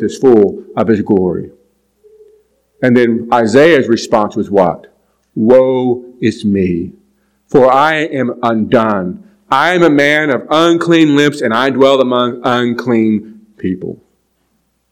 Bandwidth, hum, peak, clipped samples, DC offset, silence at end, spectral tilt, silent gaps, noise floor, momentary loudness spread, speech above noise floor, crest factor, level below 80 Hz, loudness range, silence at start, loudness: 13 kHz; none; 0 dBFS; 1%; under 0.1%; 0.95 s; -6 dB/octave; none; -61 dBFS; 11 LU; 51 dB; 12 dB; -52 dBFS; 3 LU; 0 s; -11 LUFS